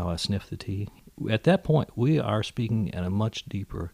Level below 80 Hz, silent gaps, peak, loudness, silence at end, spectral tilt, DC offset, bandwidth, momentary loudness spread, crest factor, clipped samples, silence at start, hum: -48 dBFS; none; -10 dBFS; -27 LUFS; 0.05 s; -7 dB/octave; under 0.1%; 15 kHz; 12 LU; 18 dB; under 0.1%; 0 s; none